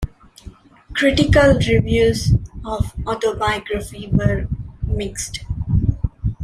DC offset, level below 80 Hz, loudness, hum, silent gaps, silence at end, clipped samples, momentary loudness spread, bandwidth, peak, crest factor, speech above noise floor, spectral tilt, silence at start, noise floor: under 0.1%; -28 dBFS; -19 LUFS; none; none; 0 s; under 0.1%; 13 LU; 14.5 kHz; -2 dBFS; 16 dB; 24 dB; -6 dB/octave; 0 s; -41 dBFS